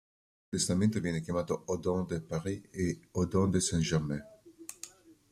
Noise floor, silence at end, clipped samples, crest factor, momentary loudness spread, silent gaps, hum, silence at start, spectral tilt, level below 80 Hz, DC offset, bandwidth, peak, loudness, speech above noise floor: -52 dBFS; 0.2 s; under 0.1%; 18 dB; 16 LU; none; none; 0.5 s; -5.5 dB/octave; -58 dBFS; under 0.1%; 15 kHz; -16 dBFS; -32 LUFS; 21 dB